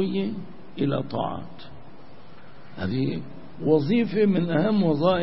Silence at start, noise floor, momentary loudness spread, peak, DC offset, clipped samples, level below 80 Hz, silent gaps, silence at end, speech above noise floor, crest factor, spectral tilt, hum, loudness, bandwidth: 0 s; -48 dBFS; 21 LU; -8 dBFS; 1%; under 0.1%; -56 dBFS; none; 0 s; 25 dB; 18 dB; -11.5 dB/octave; none; -24 LUFS; 5.8 kHz